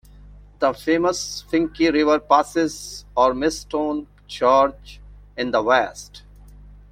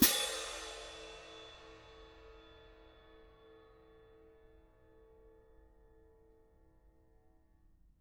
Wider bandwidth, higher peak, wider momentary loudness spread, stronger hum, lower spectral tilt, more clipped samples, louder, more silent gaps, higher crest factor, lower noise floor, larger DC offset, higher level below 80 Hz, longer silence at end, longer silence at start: second, 16 kHz vs over 20 kHz; first, -2 dBFS vs -10 dBFS; second, 13 LU vs 25 LU; first, 50 Hz at -45 dBFS vs none; first, -4 dB/octave vs -1.5 dB/octave; neither; first, -20 LUFS vs -38 LUFS; neither; second, 20 dB vs 32 dB; second, -44 dBFS vs -67 dBFS; neither; first, -46 dBFS vs -64 dBFS; second, 0.2 s vs 4.45 s; first, 0.35 s vs 0 s